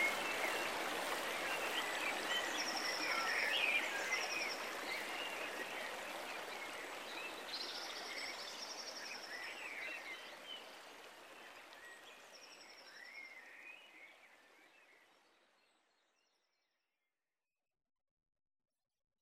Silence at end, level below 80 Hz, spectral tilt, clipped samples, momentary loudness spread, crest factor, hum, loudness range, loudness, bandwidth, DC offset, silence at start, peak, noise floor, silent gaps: 4.15 s; -84 dBFS; 0 dB/octave; under 0.1%; 19 LU; 22 dB; none; 19 LU; -41 LUFS; 16 kHz; under 0.1%; 0 s; -22 dBFS; under -90 dBFS; none